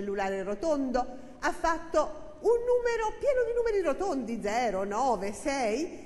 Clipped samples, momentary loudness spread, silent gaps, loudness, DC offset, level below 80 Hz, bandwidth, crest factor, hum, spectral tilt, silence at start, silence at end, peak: under 0.1%; 5 LU; none; -30 LUFS; 0.3%; -48 dBFS; 12 kHz; 16 dB; none; -4.5 dB/octave; 0 s; 0 s; -14 dBFS